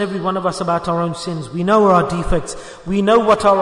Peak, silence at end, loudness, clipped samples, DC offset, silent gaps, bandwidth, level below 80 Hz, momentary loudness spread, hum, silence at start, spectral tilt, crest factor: -2 dBFS; 0 s; -17 LUFS; under 0.1%; under 0.1%; none; 11 kHz; -34 dBFS; 12 LU; none; 0 s; -6 dB/octave; 14 dB